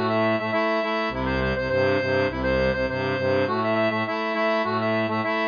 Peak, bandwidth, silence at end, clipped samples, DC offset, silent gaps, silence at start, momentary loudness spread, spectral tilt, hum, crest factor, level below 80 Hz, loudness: -10 dBFS; 5.2 kHz; 0 s; under 0.1%; under 0.1%; none; 0 s; 3 LU; -7 dB/octave; none; 12 dB; -42 dBFS; -23 LUFS